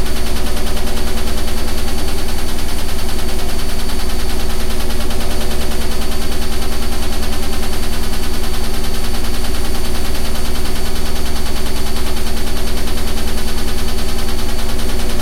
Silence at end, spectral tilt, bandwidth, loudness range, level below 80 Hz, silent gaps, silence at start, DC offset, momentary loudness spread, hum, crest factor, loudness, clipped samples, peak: 0 s; -4 dB/octave; 15 kHz; 0 LU; -18 dBFS; none; 0 s; under 0.1%; 1 LU; 60 Hz at -35 dBFS; 8 dB; -22 LUFS; under 0.1%; -2 dBFS